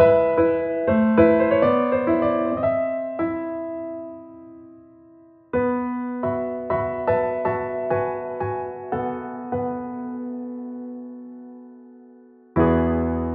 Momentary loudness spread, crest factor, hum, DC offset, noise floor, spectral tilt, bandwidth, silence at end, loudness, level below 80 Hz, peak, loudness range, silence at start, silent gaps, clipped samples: 18 LU; 18 dB; none; under 0.1%; -50 dBFS; -7 dB/octave; 4.3 kHz; 0 s; -23 LUFS; -44 dBFS; -4 dBFS; 10 LU; 0 s; none; under 0.1%